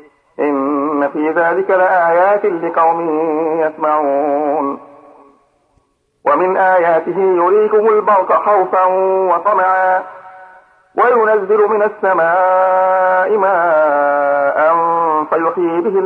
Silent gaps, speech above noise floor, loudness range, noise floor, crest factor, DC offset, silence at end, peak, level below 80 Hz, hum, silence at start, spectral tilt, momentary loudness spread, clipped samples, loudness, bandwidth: none; 47 dB; 4 LU; -59 dBFS; 12 dB; under 0.1%; 0 s; -2 dBFS; -68 dBFS; none; 0.4 s; -8 dB/octave; 5 LU; under 0.1%; -13 LUFS; 4.4 kHz